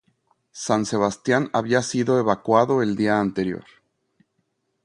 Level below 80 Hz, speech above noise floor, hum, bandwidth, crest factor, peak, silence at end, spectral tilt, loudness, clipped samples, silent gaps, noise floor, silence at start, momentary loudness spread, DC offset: -58 dBFS; 52 dB; none; 11.5 kHz; 20 dB; -2 dBFS; 1.25 s; -5.5 dB/octave; -21 LUFS; under 0.1%; none; -73 dBFS; 0.55 s; 8 LU; under 0.1%